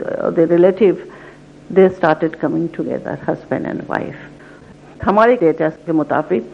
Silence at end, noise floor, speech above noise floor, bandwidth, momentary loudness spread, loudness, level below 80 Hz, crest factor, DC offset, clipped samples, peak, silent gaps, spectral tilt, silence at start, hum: 0 s; -40 dBFS; 25 dB; 7.2 kHz; 11 LU; -16 LUFS; -50 dBFS; 16 dB; under 0.1%; under 0.1%; 0 dBFS; none; -8.5 dB/octave; 0 s; none